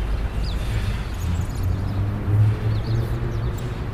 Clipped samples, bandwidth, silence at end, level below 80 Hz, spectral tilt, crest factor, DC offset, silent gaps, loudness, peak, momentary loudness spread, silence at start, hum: under 0.1%; 15 kHz; 0 s; -28 dBFS; -7 dB/octave; 14 dB; under 0.1%; none; -24 LUFS; -8 dBFS; 7 LU; 0 s; none